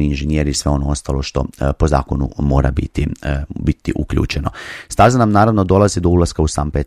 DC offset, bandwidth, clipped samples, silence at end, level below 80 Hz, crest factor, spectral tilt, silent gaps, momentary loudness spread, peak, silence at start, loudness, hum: under 0.1%; 13 kHz; under 0.1%; 0 s; -24 dBFS; 16 dB; -6.5 dB/octave; none; 9 LU; 0 dBFS; 0 s; -16 LUFS; none